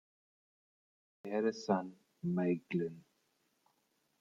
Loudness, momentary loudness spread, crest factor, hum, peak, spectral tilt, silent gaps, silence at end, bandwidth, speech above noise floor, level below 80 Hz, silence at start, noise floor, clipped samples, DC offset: -37 LUFS; 10 LU; 22 dB; none; -18 dBFS; -7.5 dB/octave; none; 1.2 s; 7.2 kHz; 43 dB; -82 dBFS; 1.25 s; -78 dBFS; under 0.1%; under 0.1%